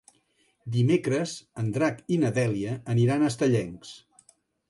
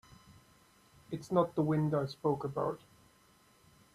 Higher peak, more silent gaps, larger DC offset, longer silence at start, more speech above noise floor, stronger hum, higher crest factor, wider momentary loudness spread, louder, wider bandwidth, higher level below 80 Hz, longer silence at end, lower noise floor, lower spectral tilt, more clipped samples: first, -12 dBFS vs -16 dBFS; neither; neither; first, 0.65 s vs 0.3 s; first, 43 dB vs 33 dB; neither; second, 16 dB vs 22 dB; about the same, 12 LU vs 14 LU; first, -26 LUFS vs -34 LUFS; second, 11.5 kHz vs 13 kHz; first, -62 dBFS vs -68 dBFS; second, 0.7 s vs 1.15 s; about the same, -68 dBFS vs -66 dBFS; about the same, -7 dB/octave vs -8 dB/octave; neither